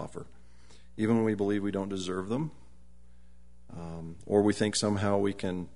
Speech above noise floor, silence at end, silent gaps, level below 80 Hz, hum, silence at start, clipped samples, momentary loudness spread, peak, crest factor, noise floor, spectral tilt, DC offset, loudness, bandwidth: 28 dB; 0.05 s; none; -58 dBFS; none; 0 s; under 0.1%; 16 LU; -12 dBFS; 20 dB; -58 dBFS; -5.5 dB/octave; 0.4%; -30 LUFS; 11 kHz